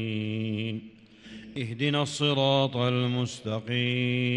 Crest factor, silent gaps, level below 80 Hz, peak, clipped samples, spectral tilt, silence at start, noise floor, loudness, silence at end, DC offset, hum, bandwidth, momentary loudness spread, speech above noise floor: 18 dB; none; -66 dBFS; -10 dBFS; under 0.1%; -5.5 dB/octave; 0 s; -49 dBFS; -27 LUFS; 0 s; under 0.1%; none; 11 kHz; 13 LU; 22 dB